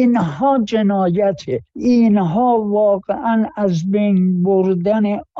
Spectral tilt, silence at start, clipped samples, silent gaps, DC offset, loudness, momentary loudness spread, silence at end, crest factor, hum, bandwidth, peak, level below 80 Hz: -8.5 dB/octave; 0 s; under 0.1%; none; under 0.1%; -16 LUFS; 5 LU; 0 s; 10 dB; none; 7.2 kHz; -6 dBFS; -52 dBFS